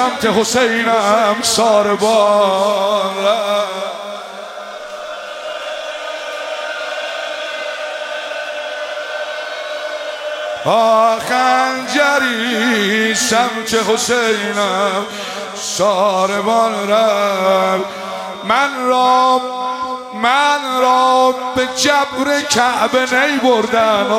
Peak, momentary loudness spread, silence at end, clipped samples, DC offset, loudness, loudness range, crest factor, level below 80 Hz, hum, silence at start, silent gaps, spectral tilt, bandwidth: 0 dBFS; 12 LU; 0 s; under 0.1%; under 0.1%; -15 LUFS; 9 LU; 16 dB; -58 dBFS; none; 0 s; none; -2.5 dB/octave; 16.5 kHz